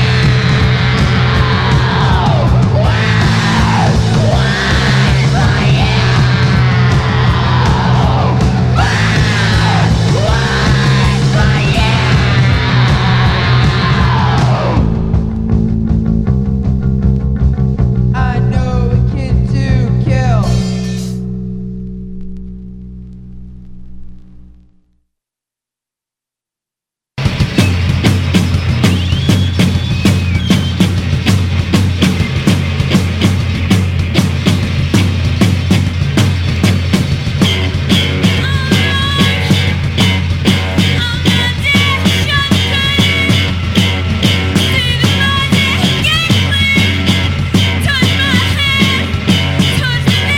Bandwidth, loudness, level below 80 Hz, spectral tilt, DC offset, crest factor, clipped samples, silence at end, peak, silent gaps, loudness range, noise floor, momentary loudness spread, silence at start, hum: 16 kHz; -12 LUFS; -22 dBFS; -5.5 dB/octave; under 0.1%; 12 dB; under 0.1%; 0 s; 0 dBFS; none; 4 LU; -86 dBFS; 4 LU; 0 s; 60 Hz at -35 dBFS